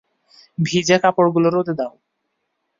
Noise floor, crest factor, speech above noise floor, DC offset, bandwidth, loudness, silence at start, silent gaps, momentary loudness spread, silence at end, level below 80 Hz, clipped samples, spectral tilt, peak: -74 dBFS; 18 dB; 57 dB; under 0.1%; 7.6 kHz; -18 LUFS; 0.6 s; none; 12 LU; 0.9 s; -60 dBFS; under 0.1%; -5 dB/octave; -2 dBFS